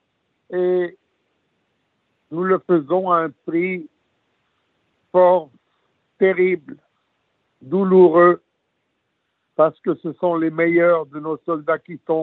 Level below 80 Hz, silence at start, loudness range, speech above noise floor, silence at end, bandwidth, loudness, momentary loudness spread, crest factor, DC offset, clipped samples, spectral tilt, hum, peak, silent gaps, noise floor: -74 dBFS; 0.5 s; 5 LU; 55 dB; 0 s; 4 kHz; -18 LUFS; 12 LU; 18 dB; under 0.1%; under 0.1%; -6.5 dB/octave; none; -2 dBFS; none; -72 dBFS